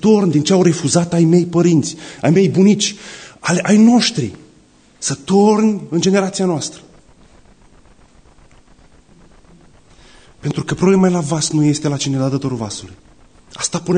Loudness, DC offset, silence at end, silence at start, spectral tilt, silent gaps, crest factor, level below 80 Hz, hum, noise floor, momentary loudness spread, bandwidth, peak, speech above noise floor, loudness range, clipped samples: -15 LUFS; under 0.1%; 0 s; 0.05 s; -5.5 dB/octave; none; 14 dB; -50 dBFS; none; -49 dBFS; 12 LU; 9.6 kHz; -2 dBFS; 35 dB; 10 LU; under 0.1%